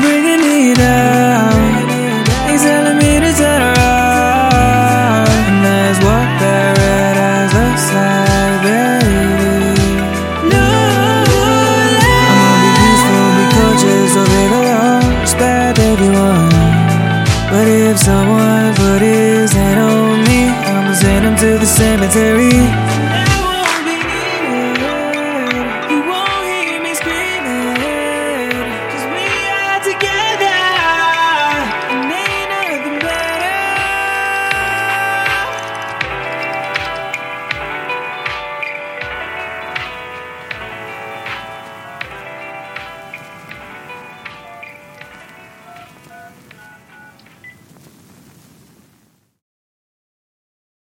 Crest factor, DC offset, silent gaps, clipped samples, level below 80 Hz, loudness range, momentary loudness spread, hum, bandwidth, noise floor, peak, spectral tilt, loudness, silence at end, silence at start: 12 dB; under 0.1%; none; under 0.1%; -28 dBFS; 15 LU; 16 LU; none; 17 kHz; -56 dBFS; 0 dBFS; -4.5 dB/octave; -12 LUFS; 3.45 s; 0 s